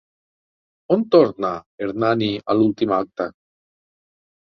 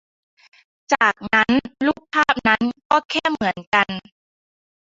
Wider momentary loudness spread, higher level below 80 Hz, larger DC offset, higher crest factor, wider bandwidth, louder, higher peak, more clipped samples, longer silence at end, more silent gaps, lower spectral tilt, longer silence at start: first, 12 LU vs 7 LU; about the same, -60 dBFS vs -56 dBFS; neither; about the same, 20 dB vs 20 dB; second, 6.2 kHz vs 7.8 kHz; about the same, -20 LUFS vs -19 LUFS; about the same, -2 dBFS vs -2 dBFS; neither; first, 1.2 s vs 0.85 s; about the same, 1.66-1.78 s vs 2.85-2.90 s, 3.05-3.09 s, 3.67-3.72 s; first, -8 dB/octave vs -4 dB/octave; about the same, 0.9 s vs 0.9 s